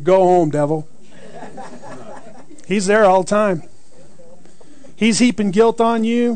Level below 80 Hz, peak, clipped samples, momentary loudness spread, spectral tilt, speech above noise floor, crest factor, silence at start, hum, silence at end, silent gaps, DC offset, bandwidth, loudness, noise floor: -54 dBFS; -4 dBFS; under 0.1%; 23 LU; -5 dB/octave; 33 dB; 14 dB; 0 s; none; 0 s; none; 3%; 9.4 kHz; -16 LUFS; -47 dBFS